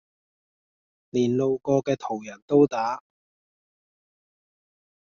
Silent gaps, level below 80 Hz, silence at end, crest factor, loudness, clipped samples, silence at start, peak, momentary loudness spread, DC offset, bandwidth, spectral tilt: 2.42-2.48 s; -68 dBFS; 2.2 s; 20 dB; -24 LUFS; under 0.1%; 1.15 s; -6 dBFS; 12 LU; under 0.1%; 7 kHz; -7 dB/octave